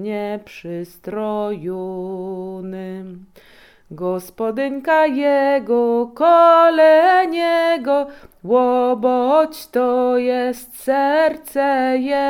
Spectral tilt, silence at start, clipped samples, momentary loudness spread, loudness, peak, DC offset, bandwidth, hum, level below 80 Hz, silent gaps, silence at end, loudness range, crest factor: -5.5 dB/octave; 0 s; under 0.1%; 18 LU; -17 LUFS; -2 dBFS; under 0.1%; 17.5 kHz; none; -58 dBFS; none; 0 s; 13 LU; 16 dB